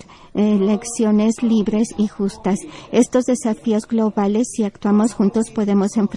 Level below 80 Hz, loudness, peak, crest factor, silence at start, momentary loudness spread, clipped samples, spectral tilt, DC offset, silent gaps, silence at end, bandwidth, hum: -52 dBFS; -19 LUFS; -2 dBFS; 16 dB; 0.35 s; 5 LU; under 0.1%; -6.5 dB/octave; under 0.1%; none; 0 s; 11.5 kHz; none